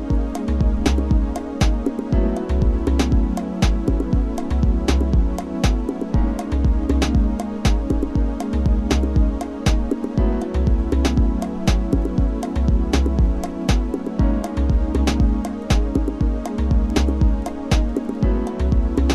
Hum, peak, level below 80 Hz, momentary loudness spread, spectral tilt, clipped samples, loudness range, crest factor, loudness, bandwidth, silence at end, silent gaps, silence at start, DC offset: none; -2 dBFS; -20 dBFS; 4 LU; -7 dB/octave; under 0.1%; 1 LU; 16 dB; -21 LUFS; 12.5 kHz; 0 s; none; 0 s; under 0.1%